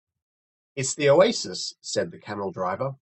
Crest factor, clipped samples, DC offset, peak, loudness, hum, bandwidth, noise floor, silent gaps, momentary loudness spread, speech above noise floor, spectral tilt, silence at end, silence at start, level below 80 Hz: 22 dB; under 0.1%; under 0.1%; -4 dBFS; -24 LUFS; none; 8.8 kHz; under -90 dBFS; none; 14 LU; over 66 dB; -4 dB/octave; 0.1 s; 0.75 s; -66 dBFS